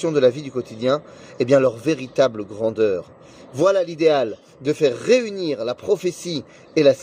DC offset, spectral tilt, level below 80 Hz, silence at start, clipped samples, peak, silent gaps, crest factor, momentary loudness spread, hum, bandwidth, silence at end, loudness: under 0.1%; -5.5 dB/octave; -64 dBFS; 0 s; under 0.1%; -4 dBFS; none; 16 dB; 11 LU; none; 15.5 kHz; 0 s; -21 LUFS